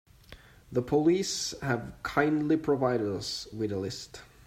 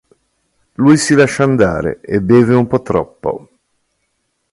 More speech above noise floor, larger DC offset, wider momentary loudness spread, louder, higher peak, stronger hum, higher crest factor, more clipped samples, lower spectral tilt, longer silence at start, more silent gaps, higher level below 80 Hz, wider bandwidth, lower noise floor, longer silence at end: second, 24 dB vs 55 dB; neither; second, 9 LU vs 13 LU; second, -29 LUFS vs -13 LUFS; second, -10 dBFS vs 0 dBFS; neither; first, 20 dB vs 14 dB; neither; about the same, -5 dB/octave vs -6 dB/octave; second, 0.3 s vs 0.8 s; neither; second, -56 dBFS vs -42 dBFS; first, 15.5 kHz vs 11.5 kHz; second, -53 dBFS vs -67 dBFS; second, 0.25 s vs 1.15 s